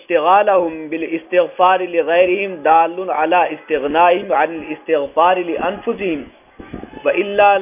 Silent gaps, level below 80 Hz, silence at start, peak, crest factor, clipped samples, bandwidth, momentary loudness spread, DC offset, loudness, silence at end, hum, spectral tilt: none; -52 dBFS; 0.1 s; 0 dBFS; 16 dB; under 0.1%; 3.7 kHz; 10 LU; under 0.1%; -16 LUFS; 0 s; none; -8.5 dB/octave